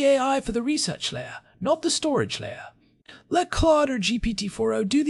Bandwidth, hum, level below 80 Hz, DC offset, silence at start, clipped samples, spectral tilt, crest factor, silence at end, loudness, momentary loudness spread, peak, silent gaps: 12 kHz; none; -42 dBFS; under 0.1%; 0 s; under 0.1%; -4 dB/octave; 16 dB; 0 s; -24 LUFS; 12 LU; -10 dBFS; none